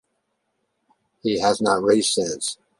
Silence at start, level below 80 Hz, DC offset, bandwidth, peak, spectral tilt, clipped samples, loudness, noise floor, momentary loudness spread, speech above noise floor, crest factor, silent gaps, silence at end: 1.25 s; -62 dBFS; under 0.1%; 11.5 kHz; -4 dBFS; -3 dB/octave; under 0.1%; -21 LUFS; -74 dBFS; 9 LU; 53 dB; 20 dB; none; 0.25 s